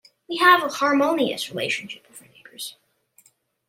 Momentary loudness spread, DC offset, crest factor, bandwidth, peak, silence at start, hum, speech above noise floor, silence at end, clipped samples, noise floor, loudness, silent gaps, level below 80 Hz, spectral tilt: 19 LU; under 0.1%; 20 dB; 16.5 kHz; -4 dBFS; 0.3 s; none; 40 dB; 1 s; under 0.1%; -61 dBFS; -20 LUFS; none; -74 dBFS; -3 dB/octave